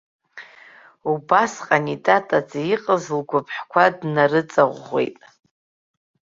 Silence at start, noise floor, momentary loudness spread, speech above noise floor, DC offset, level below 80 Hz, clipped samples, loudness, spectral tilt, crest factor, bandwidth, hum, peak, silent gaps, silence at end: 0.35 s; -48 dBFS; 8 LU; 28 dB; under 0.1%; -68 dBFS; under 0.1%; -20 LUFS; -5.5 dB/octave; 20 dB; 7.8 kHz; none; -2 dBFS; none; 1.2 s